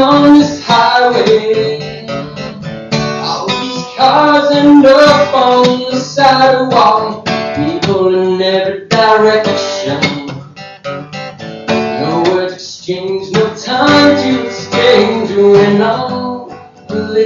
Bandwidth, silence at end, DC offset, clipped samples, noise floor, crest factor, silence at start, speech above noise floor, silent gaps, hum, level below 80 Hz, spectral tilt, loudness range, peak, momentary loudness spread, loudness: 7.6 kHz; 0 s; under 0.1%; under 0.1%; -30 dBFS; 10 dB; 0 s; 23 dB; none; none; -48 dBFS; -5 dB/octave; 8 LU; 0 dBFS; 16 LU; -10 LUFS